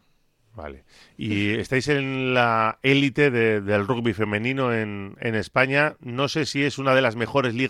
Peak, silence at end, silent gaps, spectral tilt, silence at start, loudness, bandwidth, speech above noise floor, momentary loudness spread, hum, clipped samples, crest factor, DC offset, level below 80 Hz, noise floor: -4 dBFS; 0 s; none; -5.5 dB/octave; 0.55 s; -22 LUFS; 13.5 kHz; 41 dB; 9 LU; none; under 0.1%; 18 dB; under 0.1%; -56 dBFS; -63 dBFS